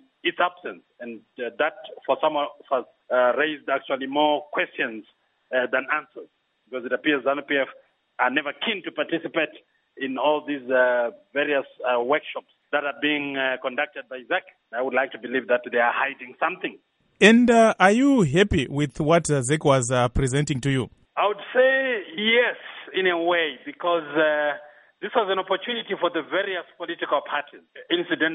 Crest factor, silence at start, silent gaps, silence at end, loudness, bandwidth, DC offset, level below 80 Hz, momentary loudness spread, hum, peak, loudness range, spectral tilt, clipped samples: 24 dB; 0.25 s; none; 0 s; -23 LUFS; 11 kHz; under 0.1%; -48 dBFS; 12 LU; none; 0 dBFS; 7 LU; -5 dB/octave; under 0.1%